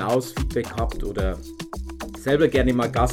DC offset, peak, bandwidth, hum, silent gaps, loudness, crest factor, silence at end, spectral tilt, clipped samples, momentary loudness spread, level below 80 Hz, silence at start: under 0.1%; -6 dBFS; 16.5 kHz; none; none; -23 LUFS; 18 dB; 0 s; -6 dB/octave; under 0.1%; 15 LU; -30 dBFS; 0 s